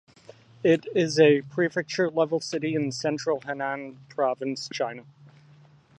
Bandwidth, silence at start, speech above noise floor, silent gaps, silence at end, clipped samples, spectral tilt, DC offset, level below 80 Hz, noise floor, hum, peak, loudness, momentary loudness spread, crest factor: 9.4 kHz; 0.6 s; 29 dB; none; 0.7 s; under 0.1%; -5 dB/octave; under 0.1%; -74 dBFS; -55 dBFS; none; -6 dBFS; -26 LUFS; 12 LU; 20 dB